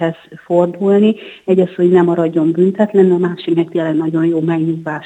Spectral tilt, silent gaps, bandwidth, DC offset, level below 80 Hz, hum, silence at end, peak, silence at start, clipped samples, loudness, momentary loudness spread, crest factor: -9 dB/octave; none; 8.2 kHz; under 0.1%; -64 dBFS; none; 0 s; 0 dBFS; 0 s; under 0.1%; -14 LUFS; 6 LU; 14 dB